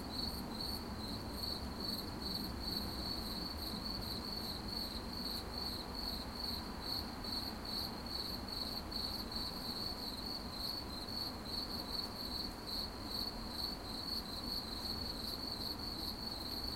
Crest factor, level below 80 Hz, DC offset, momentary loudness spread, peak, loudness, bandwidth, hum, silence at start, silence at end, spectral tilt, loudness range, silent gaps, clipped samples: 16 dB; -52 dBFS; under 0.1%; 2 LU; -28 dBFS; -41 LUFS; 16.5 kHz; none; 0 s; 0 s; -4 dB/octave; 0 LU; none; under 0.1%